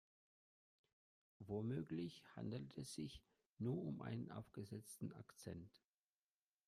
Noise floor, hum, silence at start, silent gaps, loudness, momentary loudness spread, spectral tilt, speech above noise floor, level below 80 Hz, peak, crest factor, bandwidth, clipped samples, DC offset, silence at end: under -90 dBFS; none; 1.4 s; 3.46-3.56 s; -51 LUFS; 11 LU; -6.5 dB/octave; over 41 dB; -78 dBFS; -34 dBFS; 18 dB; 15 kHz; under 0.1%; under 0.1%; 0.9 s